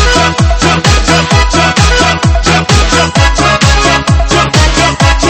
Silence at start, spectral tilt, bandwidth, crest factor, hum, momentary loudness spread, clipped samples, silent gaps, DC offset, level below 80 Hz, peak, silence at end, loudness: 0 s; -4 dB/octave; 13 kHz; 8 dB; none; 2 LU; 1%; none; under 0.1%; -14 dBFS; 0 dBFS; 0 s; -8 LUFS